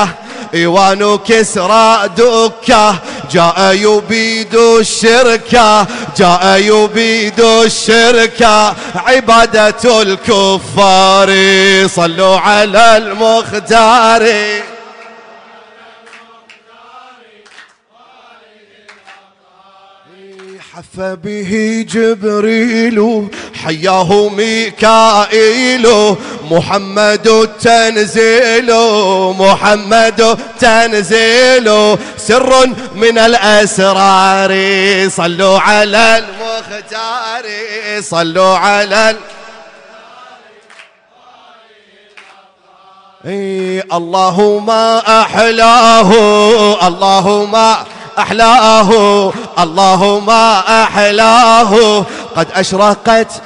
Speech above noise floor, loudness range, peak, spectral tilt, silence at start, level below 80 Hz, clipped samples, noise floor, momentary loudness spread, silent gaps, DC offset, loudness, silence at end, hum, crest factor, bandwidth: 36 dB; 7 LU; 0 dBFS; -3.5 dB/octave; 0 s; -42 dBFS; under 0.1%; -45 dBFS; 10 LU; none; under 0.1%; -8 LUFS; 0 s; none; 10 dB; 11 kHz